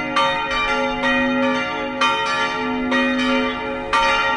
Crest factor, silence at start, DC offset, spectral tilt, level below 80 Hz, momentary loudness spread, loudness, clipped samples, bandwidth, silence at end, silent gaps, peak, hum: 16 dB; 0 s; under 0.1%; -3.5 dB/octave; -44 dBFS; 4 LU; -19 LUFS; under 0.1%; 10.5 kHz; 0 s; none; -4 dBFS; none